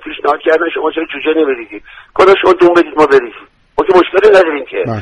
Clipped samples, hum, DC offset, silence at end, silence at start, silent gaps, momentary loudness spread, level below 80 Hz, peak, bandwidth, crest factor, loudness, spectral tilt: 0.3%; none; under 0.1%; 0 s; 0 s; none; 14 LU; -46 dBFS; 0 dBFS; 9.8 kHz; 10 dB; -10 LUFS; -6 dB/octave